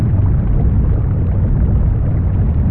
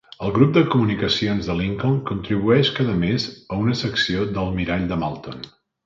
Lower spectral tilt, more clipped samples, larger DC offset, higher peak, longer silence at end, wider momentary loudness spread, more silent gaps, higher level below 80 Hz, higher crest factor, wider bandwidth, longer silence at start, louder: first, -14.5 dB/octave vs -6.5 dB/octave; neither; neither; second, -4 dBFS vs 0 dBFS; second, 0 s vs 0.35 s; second, 1 LU vs 9 LU; neither; first, -16 dBFS vs -42 dBFS; second, 10 dB vs 20 dB; second, 2.9 kHz vs 7.6 kHz; second, 0 s vs 0.2 s; first, -16 LUFS vs -21 LUFS